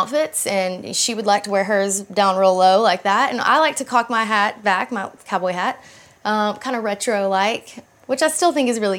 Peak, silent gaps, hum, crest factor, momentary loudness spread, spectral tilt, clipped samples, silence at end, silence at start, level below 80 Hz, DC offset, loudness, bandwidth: -4 dBFS; none; none; 16 dB; 8 LU; -2.5 dB/octave; under 0.1%; 0 s; 0 s; -70 dBFS; under 0.1%; -19 LUFS; 18 kHz